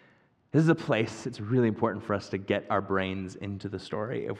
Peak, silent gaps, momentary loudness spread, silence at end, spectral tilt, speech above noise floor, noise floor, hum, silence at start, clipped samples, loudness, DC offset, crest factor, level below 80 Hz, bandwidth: -10 dBFS; none; 12 LU; 0 s; -7 dB/octave; 35 dB; -63 dBFS; none; 0.55 s; under 0.1%; -29 LUFS; under 0.1%; 20 dB; -70 dBFS; 10 kHz